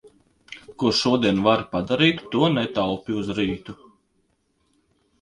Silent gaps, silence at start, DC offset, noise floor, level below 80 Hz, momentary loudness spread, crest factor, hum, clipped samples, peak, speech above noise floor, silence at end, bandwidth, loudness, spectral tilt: none; 0.5 s; under 0.1%; -68 dBFS; -52 dBFS; 19 LU; 22 dB; none; under 0.1%; -2 dBFS; 47 dB; 1.5 s; 11 kHz; -22 LUFS; -5.5 dB/octave